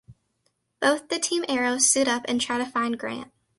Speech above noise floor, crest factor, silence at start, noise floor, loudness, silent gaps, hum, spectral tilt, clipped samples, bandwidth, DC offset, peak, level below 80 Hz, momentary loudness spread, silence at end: 48 dB; 20 dB; 0.1 s; -73 dBFS; -24 LUFS; none; none; -1 dB/octave; under 0.1%; 11.5 kHz; under 0.1%; -6 dBFS; -66 dBFS; 10 LU; 0.35 s